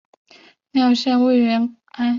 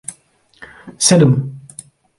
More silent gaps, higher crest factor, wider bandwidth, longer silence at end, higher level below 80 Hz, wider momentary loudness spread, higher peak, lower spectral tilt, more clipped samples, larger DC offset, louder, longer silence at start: neither; second, 12 dB vs 18 dB; second, 7.4 kHz vs 11.5 kHz; second, 0 s vs 0.6 s; second, -66 dBFS vs -52 dBFS; second, 8 LU vs 25 LU; second, -8 dBFS vs 0 dBFS; about the same, -5 dB/octave vs -4.5 dB/octave; neither; neither; second, -18 LUFS vs -13 LUFS; first, 0.75 s vs 0.1 s